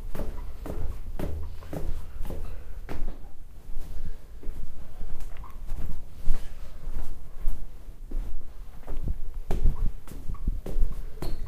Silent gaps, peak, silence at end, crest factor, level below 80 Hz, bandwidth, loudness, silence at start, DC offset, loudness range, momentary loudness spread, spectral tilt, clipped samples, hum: none; -4 dBFS; 0 s; 18 dB; -28 dBFS; 4.4 kHz; -39 LUFS; 0 s; under 0.1%; 6 LU; 11 LU; -7 dB/octave; under 0.1%; none